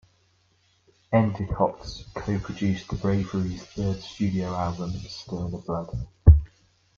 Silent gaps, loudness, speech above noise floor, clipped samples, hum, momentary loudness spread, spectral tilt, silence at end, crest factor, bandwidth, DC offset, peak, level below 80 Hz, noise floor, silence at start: none; -26 LUFS; 38 dB; under 0.1%; none; 14 LU; -8 dB/octave; 0.5 s; 24 dB; 7.2 kHz; under 0.1%; -2 dBFS; -32 dBFS; -65 dBFS; 1.1 s